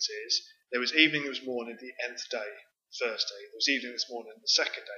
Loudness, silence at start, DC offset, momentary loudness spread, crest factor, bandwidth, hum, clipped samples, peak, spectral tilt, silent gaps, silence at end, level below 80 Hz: -29 LUFS; 0 s; under 0.1%; 14 LU; 28 dB; 7.4 kHz; none; under 0.1%; -4 dBFS; -1 dB/octave; none; 0 s; under -90 dBFS